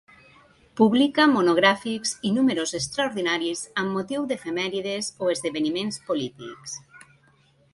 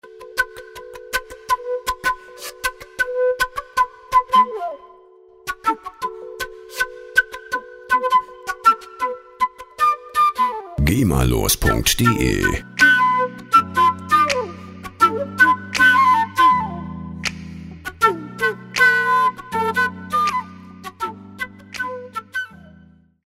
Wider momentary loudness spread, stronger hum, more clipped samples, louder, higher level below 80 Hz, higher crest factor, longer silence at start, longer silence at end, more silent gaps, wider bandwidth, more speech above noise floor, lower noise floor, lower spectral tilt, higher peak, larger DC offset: about the same, 14 LU vs 16 LU; neither; neither; second, -24 LUFS vs -19 LUFS; second, -64 dBFS vs -36 dBFS; about the same, 22 dB vs 18 dB; first, 0.75 s vs 0.05 s; about the same, 0.75 s vs 0.8 s; neither; second, 11.5 kHz vs 16 kHz; first, 36 dB vs 32 dB; first, -60 dBFS vs -49 dBFS; about the same, -4 dB/octave vs -3.5 dB/octave; about the same, -4 dBFS vs -2 dBFS; neither